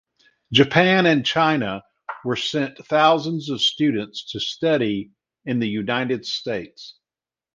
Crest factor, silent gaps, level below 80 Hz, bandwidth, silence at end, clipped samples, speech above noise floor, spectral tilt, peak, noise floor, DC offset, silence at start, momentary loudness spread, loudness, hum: 22 dB; none; -60 dBFS; 9.4 kHz; 0.65 s; under 0.1%; over 69 dB; -5 dB/octave; 0 dBFS; under -90 dBFS; under 0.1%; 0.5 s; 16 LU; -21 LUFS; none